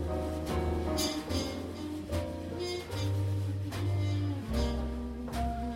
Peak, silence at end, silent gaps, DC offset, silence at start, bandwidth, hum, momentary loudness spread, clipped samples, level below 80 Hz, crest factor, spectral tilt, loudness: -18 dBFS; 0 s; none; under 0.1%; 0 s; 16 kHz; none; 6 LU; under 0.1%; -40 dBFS; 16 dB; -6 dB/octave; -34 LUFS